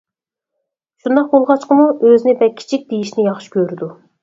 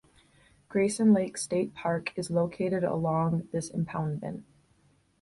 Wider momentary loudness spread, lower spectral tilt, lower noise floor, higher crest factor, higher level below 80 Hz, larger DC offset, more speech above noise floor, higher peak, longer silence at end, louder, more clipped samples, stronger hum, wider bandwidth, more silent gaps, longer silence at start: about the same, 11 LU vs 10 LU; about the same, -7 dB/octave vs -6.5 dB/octave; first, -83 dBFS vs -66 dBFS; about the same, 14 dB vs 18 dB; about the same, -66 dBFS vs -62 dBFS; neither; first, 70 dB vs 38 dB; first, 0 dBFS vs -12 dBFS; second, 0.3 s vs 0.8 s; first, -14 LUFS vs -29 LUFS; neither; neither; second, 7.8 kHz vs 11.5 kHz; neither; first, 1.05 s vs 0.7 s